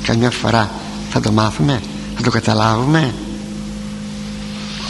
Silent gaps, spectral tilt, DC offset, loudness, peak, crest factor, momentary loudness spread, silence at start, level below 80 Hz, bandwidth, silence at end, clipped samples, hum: none; -5.5 dB/octave; under 0.1%; -18 LUFS; 0 dBFS; 18 dB; 12 LU; 0 s; -36 dBFS; 11.5 kHz; 0 s; under 0.1%; none